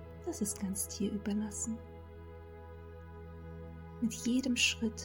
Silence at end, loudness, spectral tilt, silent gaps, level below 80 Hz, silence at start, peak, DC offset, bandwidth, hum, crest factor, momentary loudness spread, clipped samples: 0 s; -35 LUFS; -3 dB/octave; none; -56 dBFS; 0 s; -18 dBFS; under 0.1%; 18.5 kHz; none; 20 dB; 21 LU; under 0.1%